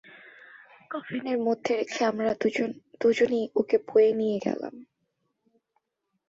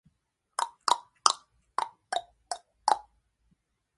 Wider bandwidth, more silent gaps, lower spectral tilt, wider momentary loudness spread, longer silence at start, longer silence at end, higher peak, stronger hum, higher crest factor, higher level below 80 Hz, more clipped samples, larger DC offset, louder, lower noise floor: second, 7.8 kHz vs 11.5 kHz; neither; first, -5.5 dB/octave vs 1.5 dB/octave; about the same, 12 LU vs 12 LU; second, 0.25 s vs 0.6 s; first, 1.45 s vs 1 s; second, -10 dBFS vs 0 dBFS; neither; second, 18 dB vs 32 dB; about the same, -70 dBFS vs -74 dBFS; neither; neither; first, -26 LUFS vs -31 LUFS; about the same, -79 dBFS vs -77 dBFS